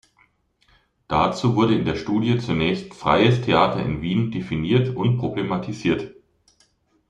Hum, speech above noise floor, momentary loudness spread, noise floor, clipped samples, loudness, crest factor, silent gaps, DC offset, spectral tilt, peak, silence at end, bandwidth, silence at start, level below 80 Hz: none; 42 dB; 8 LU; -63 dBFS; under 0.1%; -21 LUFS; 20 dB; none; under 0.1%; -7 dB/octave; -2 dBFS; 0.95 s; 9 kHz; 1.1 s; -48 dBFS